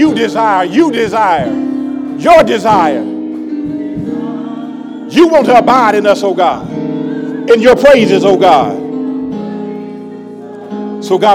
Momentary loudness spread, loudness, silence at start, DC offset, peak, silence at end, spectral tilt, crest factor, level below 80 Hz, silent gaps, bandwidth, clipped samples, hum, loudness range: 16 LU; -11 LUFS; 0 s; under 0.1%; 0 dBFS; 0 s; -5.5 dB/octave; 10 dB; -44 dBFS; none; 15.5 kHz; 3%; none; 4 LU